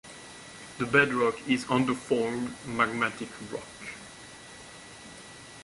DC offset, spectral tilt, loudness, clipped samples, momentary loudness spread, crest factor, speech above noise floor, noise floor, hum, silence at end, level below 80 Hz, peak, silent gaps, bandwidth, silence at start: under 0.1%; -4.5 dB/octave; -28 LUFS; under 0.1%; 21 LU; 24 dB; 19 dB; -47 dBFS; none; 0 s; -62 dBFS; -6 dBFS; none; 11.5 kHz; 0.05 s